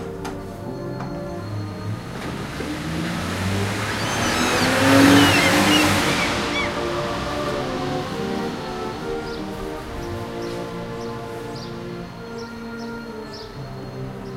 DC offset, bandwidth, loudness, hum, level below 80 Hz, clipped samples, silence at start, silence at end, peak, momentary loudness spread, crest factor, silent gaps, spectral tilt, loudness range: under 0.1%; 16 kHz; -22 LUFS; none; -42 dBFS; under 0.1%; 0 s; 0 s; -2 dBFS; 17 LU; 22 dB; none; -4 dB/octave; 14 LU